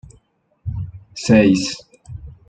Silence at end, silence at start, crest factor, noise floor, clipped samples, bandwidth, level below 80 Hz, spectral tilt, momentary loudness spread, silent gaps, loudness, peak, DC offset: 0.2 s; 0.65 s; 18 dB; -59 dBFS; under 0.1%; 9.4 kHz; -42 dBFS; -5.5 dB/octave; 24 LU; none; -17 LUFS; -2 dBFS; under 0.1%